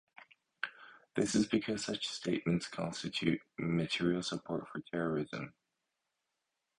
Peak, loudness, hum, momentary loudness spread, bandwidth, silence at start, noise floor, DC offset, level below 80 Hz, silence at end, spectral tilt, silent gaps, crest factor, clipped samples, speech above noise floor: -16 dBFS; -36 LUFS; none; 11 LU; 11 kHz; 0.2 s; -86 dBFS; under 0.1%; -68 dBFS; 1.3 s; -5 dB/octave; none; 22 dB; under 0.1%; 51 dB